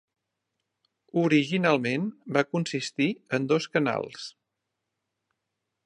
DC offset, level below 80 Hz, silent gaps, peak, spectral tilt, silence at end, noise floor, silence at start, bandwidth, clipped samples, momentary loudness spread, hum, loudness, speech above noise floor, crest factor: under 0.1%; -76 dBFS; none; -6 dBFS; -5.5 dB/octave; 1.55 s; -83 dBFS; 1.15 s; 10.5 kHz; under 0.1%; 9 LU; none; -26 LUFS; 57 dB; 22 dB